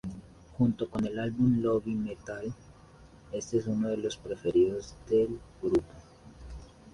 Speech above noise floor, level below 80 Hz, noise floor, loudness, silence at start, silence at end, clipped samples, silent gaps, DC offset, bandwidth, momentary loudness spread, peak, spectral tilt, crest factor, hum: 25 dB; -54 dBFS; -54 dBFS; -31 LUFS; 0.05 s; 0.05 s; under 0.1%; none; under 0.1%; 11 kHz; 22 LU; -14 dBFS; -7 dB/octave; 18 dB; none